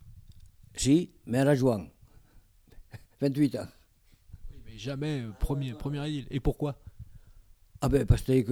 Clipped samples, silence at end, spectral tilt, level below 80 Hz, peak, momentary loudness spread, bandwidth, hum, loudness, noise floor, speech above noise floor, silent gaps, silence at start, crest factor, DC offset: under 0.1%; 0 s; -6.5 dB/octave; -42 dBFS; -10 dBFS; 20 LU; 17.5 kHz; none; -29 LUFS; -61 dBFS; 34 dB; none; 0.05 s; 22 dB; under 0.1%